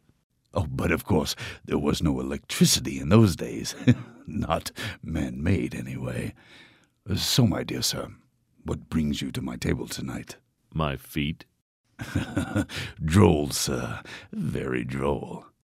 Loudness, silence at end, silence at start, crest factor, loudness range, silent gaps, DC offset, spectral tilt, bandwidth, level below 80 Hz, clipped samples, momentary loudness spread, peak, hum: -27 LUFS; 0.3 s; 0.55 s; 24 dB; 7 LU; 11.62-11.84 s; under 0.1%; -5 dB/octave; 16 kHz; -44 dBFS; under 0.1%; 15 LU; -2 dBFS; none